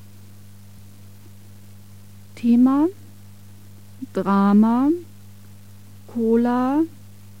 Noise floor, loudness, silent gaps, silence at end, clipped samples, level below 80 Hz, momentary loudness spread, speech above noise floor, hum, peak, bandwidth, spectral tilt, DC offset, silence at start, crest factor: -45 dBFS; -19 LUFS; none; 0.5 s; under 0.1%; -64 dBFS; 12 LU; 27 dB; 50 Hz at -40 dBFS; -8 dBFS; 16 kHz; -8.5 dB/octave; 0.7%; 2.35 s; 14 dB